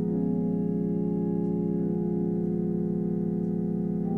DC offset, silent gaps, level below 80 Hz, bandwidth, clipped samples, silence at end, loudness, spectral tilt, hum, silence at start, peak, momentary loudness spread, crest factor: under 0.1%; none; -52 dBFS; 2.2 kHz; under 0.1%; 0 s; -28 LUFS; -13 dB/octave; none; 0 s; -16 dBFS; 1 LU; 10 dB